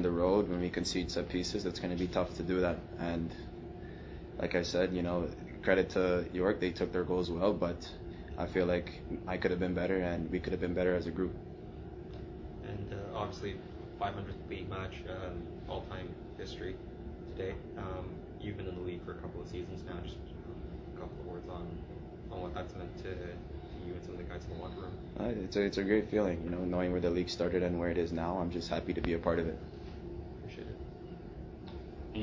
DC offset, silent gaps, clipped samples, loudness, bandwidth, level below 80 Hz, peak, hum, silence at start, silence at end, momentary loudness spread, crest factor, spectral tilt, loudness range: under 0.1%; none; under 0.1%; -36 LUFS; 8 kHz; -48 dBFS; -14 dBFS; none; 0 s; 0 s; 14 LU; 22 dB; -6.5 dB/octave; 10 LU